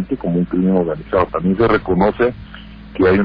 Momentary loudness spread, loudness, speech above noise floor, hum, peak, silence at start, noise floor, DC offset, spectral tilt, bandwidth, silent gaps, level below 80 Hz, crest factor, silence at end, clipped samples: 18 LU; -17 LUFS; 20 dB; none; -2 dBFS; 0 s; -35 dBFS; under 0.1%; -10.5 dB/octave; 5.2 kHz; none; -36 dBFS; 14 dB; 0 s; under 0.1%